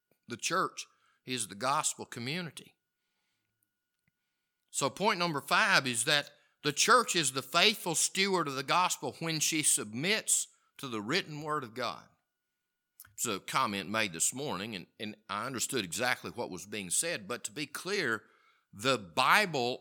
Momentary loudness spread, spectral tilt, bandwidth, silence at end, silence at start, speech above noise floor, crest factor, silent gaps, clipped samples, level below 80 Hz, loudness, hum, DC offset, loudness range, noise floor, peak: 14 LU; -2 dB/octave; 19 kHz; 0 s; 0.3 s; 54 dB; 26 dB; none; under 0.1%; -80 dBFS; -30 LUFS; none; under 0.1%; 10 LU; -86 dBFS; -8 dBFS